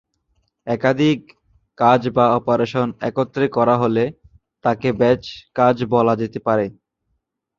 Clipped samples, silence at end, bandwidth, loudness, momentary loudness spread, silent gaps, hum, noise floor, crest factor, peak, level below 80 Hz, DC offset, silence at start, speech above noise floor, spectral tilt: under 0.1%; 0.85 s; 7.2 kHz; -19 LUFS; 8 LU; none; none; -72 dBFS; 18 dB; -2 dBFS; -54 dBFS; under 0.1%; 0.65 s; 55 dB; -7.5 dB/octave